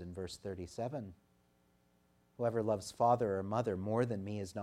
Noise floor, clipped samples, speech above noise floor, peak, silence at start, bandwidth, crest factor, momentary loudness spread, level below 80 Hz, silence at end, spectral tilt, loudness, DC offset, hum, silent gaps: -72 dBFS; under 0.1%; 36 dB; -18 dBFS; 0 s; 14.5 kHz; 20 dB; 13 LU; -70 dBFS; 0 s; -6.5 dB/octave; -37 LUFS; under 0.1%; 60 Hz at -60 dBFS; none